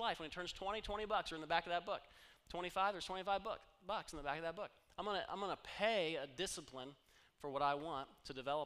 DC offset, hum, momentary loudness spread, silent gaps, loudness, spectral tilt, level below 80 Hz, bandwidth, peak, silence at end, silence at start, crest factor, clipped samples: under 0.1%; none; 12 LU; none; -43 LUFS; -3 dB/octave; -64 dBFS; 15.5 kHz; -22 dBFS; 0 s; 0 s; 22 dB; under 0.1%